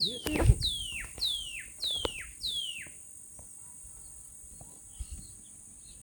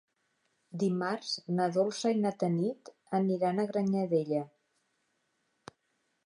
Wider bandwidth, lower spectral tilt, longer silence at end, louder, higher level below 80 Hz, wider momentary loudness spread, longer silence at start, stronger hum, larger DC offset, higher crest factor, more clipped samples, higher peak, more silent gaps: first, over 20 kHz vs 11 kHz; second, -3.5 dB/octave vs -6.5 dB/octave; second, 0 s vs 1.8 s; about the same, -32 LUFS vs -31 LUFS; first, -40 dBFS vs -82 dBFS; first, 19 LU vs 6 LU; second, 0 s vs 0.75 s; neither; neither; first, 26 dB vs 16 dB; neither; first, -8 dBFS vs -16 dBFS; neither